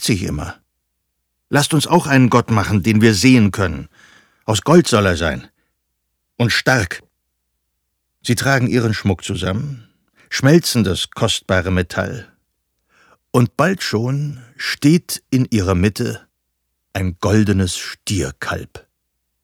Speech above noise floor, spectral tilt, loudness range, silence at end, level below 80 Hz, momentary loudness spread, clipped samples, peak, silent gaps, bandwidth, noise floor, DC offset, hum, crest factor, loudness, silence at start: 56 dB; -5 dB/octave; 6 LU; 0.65 s; -42 dBFS; 14 LU; under 0.1%; 0 dBFS; none; 18.5 kHz; -72 dBFS; under 0.1%; none; 18 dB; -17 LUFS; 0 s